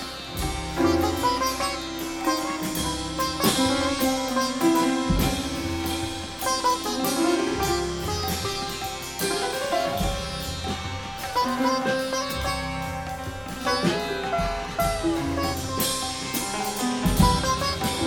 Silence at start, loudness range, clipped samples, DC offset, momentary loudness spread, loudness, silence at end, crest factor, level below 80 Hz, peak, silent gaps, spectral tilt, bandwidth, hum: 0 s; 3 LU; under 0.1%; under 0.1%; 8 LU; -25 LUFS; 0 s; 20 dB; -38 dBFS; -6 dBFS; none; -4 dB/octave; 19 kHz; none